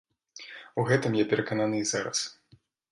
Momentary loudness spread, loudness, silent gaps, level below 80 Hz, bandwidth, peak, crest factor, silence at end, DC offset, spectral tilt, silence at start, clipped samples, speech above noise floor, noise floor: 17 LU; -28 LUFS; none; -68 dBFS; 11.5 kHz; -10 dBFS; 20 dB; 0.6 s; under 0.1%; -4.5 dB/octave; 0.35 s; under 0.1%; 35 dB; -62 dBFS